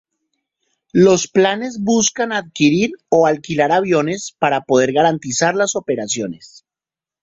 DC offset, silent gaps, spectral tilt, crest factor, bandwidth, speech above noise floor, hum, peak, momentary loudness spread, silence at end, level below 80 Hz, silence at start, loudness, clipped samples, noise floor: under 0.1%; none; -4 dB/octave; 16 dB; 8 kHz; 73 dB; none; -2 dBFS; 8 LU; 0.65 s; -58 dBFS; 0.95 s; -16 LUFS; under 0.1%; -89 dBFS